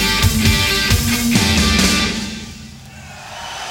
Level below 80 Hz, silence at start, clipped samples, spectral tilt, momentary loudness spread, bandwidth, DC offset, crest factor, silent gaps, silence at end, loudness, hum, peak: -26 dBFS; 0 s; under 0.1%; -3.5 dB/octave; 22 LU; 19 kHz; under 0.1%; 16 dB; none; 0 s; -14 LUFS; none; -2 dBFS